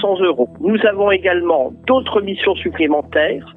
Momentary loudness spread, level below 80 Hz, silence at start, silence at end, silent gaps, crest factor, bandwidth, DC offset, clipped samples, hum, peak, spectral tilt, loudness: 4 LU; -46 dBFS; 0 s; 0.05 s; none; 16 dB; 4.1 kHz; under 0.1%; under 0.1%; none; 0 dBFS; -8 dB/octave; -16 LUFS